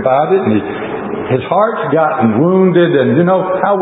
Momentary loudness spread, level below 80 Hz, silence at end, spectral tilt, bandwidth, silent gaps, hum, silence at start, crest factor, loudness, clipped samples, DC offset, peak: 9 LU; -50 dBFS; 0 s; -13 dB/octave; 4 kHz; none; none; 0 s; 12 dB; -12 LUFS; under 0.1%; under 0.1%; 0 dBFS